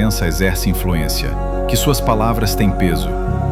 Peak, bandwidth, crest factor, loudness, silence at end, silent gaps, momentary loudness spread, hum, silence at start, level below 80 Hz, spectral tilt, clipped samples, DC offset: 0 dBFS; 16.5 kHz; 14 dB; -17 LUFS; 0 s; none; 5 LU; none; 0 s; -22 dBFS; -5 dB/octave; under 0.1%; under 0.1%